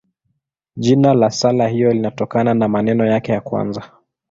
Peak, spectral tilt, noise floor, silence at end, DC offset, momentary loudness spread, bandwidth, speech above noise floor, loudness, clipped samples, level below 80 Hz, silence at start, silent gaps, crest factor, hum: -2 dBFS; -6.5 dB/octave; -70 dBFS; 0.45 s; under 0.1%; 9 LU; 7.8 kHz; 55 dB; -16 LUFS; under 0.1%; -54 dBFS; 0.75 s; none; 16 dB; none